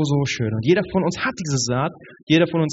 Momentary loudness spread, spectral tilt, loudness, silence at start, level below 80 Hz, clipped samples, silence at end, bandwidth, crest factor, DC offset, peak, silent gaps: 6 LU; -5.5 dB/octave; -21 LUFS; 0 s; -52 dBFS; under 0.1%; 0 s; 8 kHz; 18 dB; under 0.1%; -2 dBFS; 2.23-2.27 s